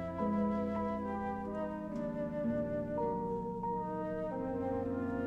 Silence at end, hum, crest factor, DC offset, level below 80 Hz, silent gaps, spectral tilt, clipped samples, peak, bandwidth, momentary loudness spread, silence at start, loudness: 0 s; none; 14 dB; under 0.1%; -56 dBFS; none; -9.5 dB/octave; under 0.1%; -22 dBFS; 7.6 kHz; 5 LU; 0 s; -37 LUFS